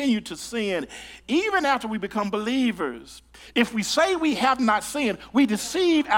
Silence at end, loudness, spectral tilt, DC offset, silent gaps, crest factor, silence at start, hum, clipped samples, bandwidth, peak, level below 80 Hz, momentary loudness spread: 0 s; -24 LUFS; -3.5 dB/octave; under 0.1%; none; 18 dB; 0 s; none; under 0.1%; 17.5 kHz; -6 dBFS; -56 dBFS; 9 LU